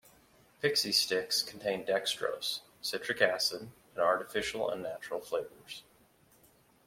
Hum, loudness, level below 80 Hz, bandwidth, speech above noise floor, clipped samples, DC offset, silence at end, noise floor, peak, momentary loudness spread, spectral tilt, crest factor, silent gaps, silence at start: none; -32 LUFS; -70 dBFS; 16.5 kHz; 32 dB; under 0.1%; under 0.1%; 1.05 s; -65 dBFS; -12 dBFS; 15 LU; -1.5 dB/octave; 24 dB; none; 0.6 s